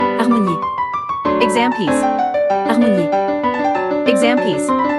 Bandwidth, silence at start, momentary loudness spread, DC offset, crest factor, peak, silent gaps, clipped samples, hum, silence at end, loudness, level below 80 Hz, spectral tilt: 12 kHz; 0 s; 5 LU; under 0.1%; 16 dB; 0 dBFS; none; under 0.1%; none; 0 s; -16 LUFS; -54 dBFS; -5.5 dB/octave